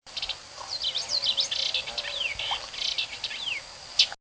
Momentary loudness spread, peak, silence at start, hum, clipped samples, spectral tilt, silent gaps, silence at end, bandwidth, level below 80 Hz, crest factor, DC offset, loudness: 9 LU; -6 dBFS; 0.05 s; none; under 0.1%; 1 dB/octave; none; 0.05 s; 8 kHz; -58 dBFS; 24 dB; under 0.1%; -28 LUFS